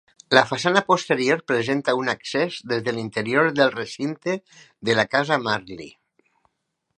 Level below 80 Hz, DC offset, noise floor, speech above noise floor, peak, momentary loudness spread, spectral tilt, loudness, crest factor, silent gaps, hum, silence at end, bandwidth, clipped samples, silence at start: -66 dBFS; under 0.1%; -76 dBFS; 54 dB; 0 dBFS; 10 LU; -4.5 dB/octave; -22 LUFS; 22 dB; none; none; 1.1 s; 11.5 kHz; under 0.1%; 0.3 s